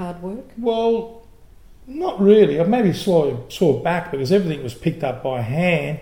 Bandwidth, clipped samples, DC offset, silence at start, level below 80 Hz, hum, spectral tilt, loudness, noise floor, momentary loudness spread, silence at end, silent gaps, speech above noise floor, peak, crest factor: 17.5 kHz; under 0.1%; 0.4%; 0 s; -48 dBFS; none; -7 dB/octave; -19 LUFS; -47 dBFS; 13 LU; 0 s; none; 28 dB; -2 dBFS; 18 dB